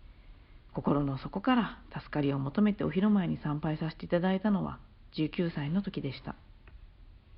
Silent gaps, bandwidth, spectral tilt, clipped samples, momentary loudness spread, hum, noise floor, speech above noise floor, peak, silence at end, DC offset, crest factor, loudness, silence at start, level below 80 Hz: none; 5.6 kHz; -6.5 dB/octave; under 0.1%; 14 LU; none; -54 dBFS; 23 dB; -14 dBFS; 0 s; under 0.1%; 18 dB; -31 LUFS; 0.1 s; -54 dBFS